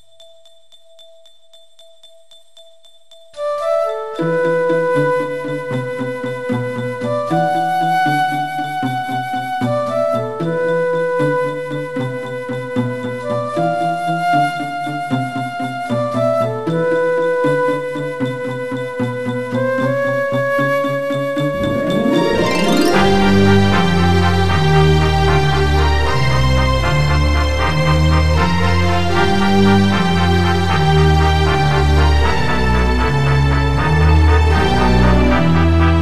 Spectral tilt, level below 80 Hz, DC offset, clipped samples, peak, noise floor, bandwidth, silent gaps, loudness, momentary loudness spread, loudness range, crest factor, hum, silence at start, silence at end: -6.5 dB/octave; -24 dBFS; under 0.1%; under 0.1%; 0 dBFS; -50 dBFS; 13.5 kHz; none; -16 LUFS; 9 LU; 6 LU; 14 dB; none; 0 s; 0 s